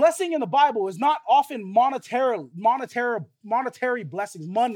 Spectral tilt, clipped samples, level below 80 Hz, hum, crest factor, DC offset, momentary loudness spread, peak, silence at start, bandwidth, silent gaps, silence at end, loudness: -4.5 dB/octave; under 0.1%; -86 dBFS; none; 16 dB; under 0.1%; 8 LU; -6 dBFS; 0 s; 17.5 kHz; none; 0 s; -23 LUFS